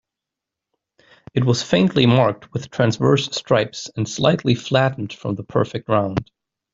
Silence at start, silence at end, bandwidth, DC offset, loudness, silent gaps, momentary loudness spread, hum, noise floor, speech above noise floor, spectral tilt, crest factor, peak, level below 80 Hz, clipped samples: 1.35 s; 0.5 s; 7.8 kHz; under 0.1%; -20 LUFS; none; 11 LU; none; -85 dBFS; 66 dB; -6 dB/octave; 18 dB; -2 dBFS; -52 dBFS; under 0.1%